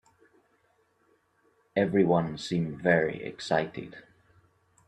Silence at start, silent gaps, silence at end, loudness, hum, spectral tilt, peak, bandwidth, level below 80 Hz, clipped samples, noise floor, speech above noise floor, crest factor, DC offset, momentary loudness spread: 1.75 s; none; 0.85 s; -28 LUFS; none; -6.5 dB/octave; -8 dBFS; 10 kHz; -64 dBFS; under 0.1%; -69 dBFS; 42 dB; 22 dB; under 0.1%; 13 LU